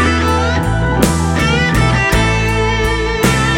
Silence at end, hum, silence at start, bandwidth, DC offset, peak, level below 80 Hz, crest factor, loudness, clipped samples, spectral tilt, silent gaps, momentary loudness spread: 0 s; none; 0 s; 16 kHz; under 0.1%; 0 dBFS; -20 dBFS; 12 dB; -13 LUFS; under 0.1%; -5 dB/octave; none; 3 LU